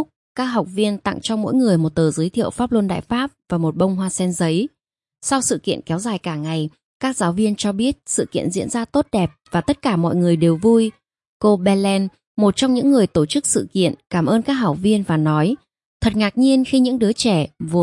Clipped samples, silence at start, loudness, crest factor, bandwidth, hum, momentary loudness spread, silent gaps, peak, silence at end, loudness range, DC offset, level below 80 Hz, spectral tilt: under 0.1%; 0 s; -19 LUFS; 14 dB; 11.5 kHz; none; 8 LU; 0.16-0.35 s, 6.83-7.00 s, 11.27-11.40 s, 12.27-12.35 s, 15.85-16.00 s; -4 dBFS; 0 s; 4 LU; under 0.1%; -48 dBFS; -5.5 dB/octave